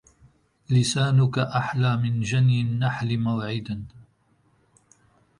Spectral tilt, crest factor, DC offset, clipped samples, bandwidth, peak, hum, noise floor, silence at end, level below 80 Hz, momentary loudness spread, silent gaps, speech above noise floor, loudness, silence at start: -6 dB/octave; 14 dB; under 0.1%; under 0.1%; 11.5 kHz; -10 dBFS; none; -64 dBFS; 1.4 s; -56 dBFS; 10 LU; none; 42 dB; -24 LUFS; 0.7 s